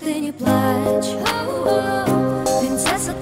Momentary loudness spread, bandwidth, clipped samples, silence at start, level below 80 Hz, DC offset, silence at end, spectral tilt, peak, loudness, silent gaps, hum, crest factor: 3 LU; 16.5 kHz; under 0.1%; 0 s; -46 dBFS; under 0.1%; 0 s; -4.5 dB/octave; -6 dBFS; -19 LUFS; none; none; 14 dB